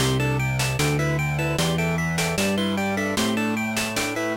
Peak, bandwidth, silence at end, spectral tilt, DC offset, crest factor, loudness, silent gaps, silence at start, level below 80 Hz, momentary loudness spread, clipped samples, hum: -10 dBFS; 17 kHz; 0 s; -4.5 dB/octave; under 0.1%; 12 dB; -23 LUFS; none; 0 s; -42 dBFS; 2 LU; under 0.1%; none